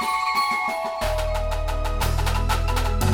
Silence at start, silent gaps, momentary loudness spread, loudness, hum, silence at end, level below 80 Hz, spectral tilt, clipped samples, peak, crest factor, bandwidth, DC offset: 0 s; none; 5 LU; -24 LUFS; none; 0 s; -26 dBFS; -4.5 dB/octave; under 0.1%; -8 dBFS; 14 dB; 19 kHz; under 0.1%